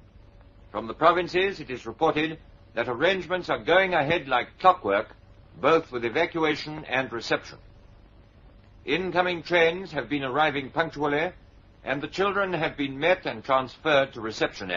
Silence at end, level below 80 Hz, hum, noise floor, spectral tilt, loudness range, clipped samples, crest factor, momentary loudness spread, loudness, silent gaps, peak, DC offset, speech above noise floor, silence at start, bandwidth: 0 s; -54 dBFS; none; -52 dBFS; -2.5 dB/octave; 4 LU; under 0.1%; 22 dB; 10 LU; -25 LUFS; none; -4 dBFS; under 0.1%; 27 dB; 0.75 s; 7.4 kHz